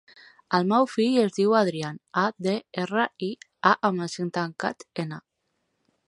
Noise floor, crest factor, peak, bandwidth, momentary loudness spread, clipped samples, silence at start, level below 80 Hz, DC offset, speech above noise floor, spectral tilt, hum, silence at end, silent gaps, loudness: -76 dBFS; 22 dB; -4 dBFS; 11.5 kHz; 12 LU; under 0.1%; 0.5 s; -74 dBFS; under 0.1%; 51 dB; -5.5 dB/octave; none; 0.9 s; none; -25 LUFS